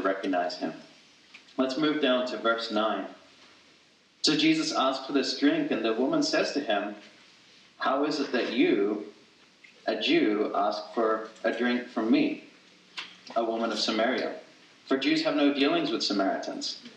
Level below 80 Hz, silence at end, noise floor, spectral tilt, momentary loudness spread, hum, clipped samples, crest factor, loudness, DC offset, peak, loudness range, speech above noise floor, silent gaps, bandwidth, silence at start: -86 dBFS; 0.05 s; -61 dBFS; -3.5 dB/octave; 12 LU; none; under 0.1%; 18 dB; -27 LUFS; under 0.1%; -10 dBFS; 3 LU; 34 dB; none; 9.4 kHz; 0 s